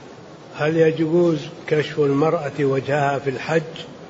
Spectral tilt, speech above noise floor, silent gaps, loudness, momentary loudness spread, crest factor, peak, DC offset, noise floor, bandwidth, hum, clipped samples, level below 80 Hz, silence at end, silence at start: -7 dB/octave; 21 dB; none; -20 LUFS; 8 LU; 14 dB; -6 dBFS; under 0.1%; -40 dBFS; 8 kHz; none; under 0.1%; -60 dBFS; 0 s; 0 s